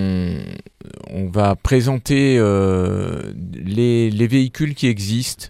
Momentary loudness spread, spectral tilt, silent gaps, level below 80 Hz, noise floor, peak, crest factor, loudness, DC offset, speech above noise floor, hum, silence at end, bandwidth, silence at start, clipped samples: 14 LU; -6.5 dB/octave; none; -38 dBFS; -38 dBFS; -2 dBFS; 16 dB; -18 LUFS; under 0.1%; 21 dB; none; 0 s; 16 kHz; 0 s; under 0.1%